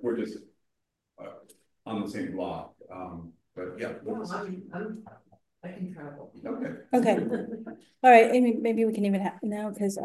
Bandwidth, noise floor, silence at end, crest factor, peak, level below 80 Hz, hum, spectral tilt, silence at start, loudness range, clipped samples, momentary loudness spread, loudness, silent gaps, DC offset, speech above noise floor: 12.5 kHz; -82 dBFS; 0 s; 24 dB; -4 dBFS; -68 dBFS; none; -6.5 dB/octave; 0 s; 15 LU; under 0.1%; 22 LU; -26 LUFS; none; under 0.1%; 55 dB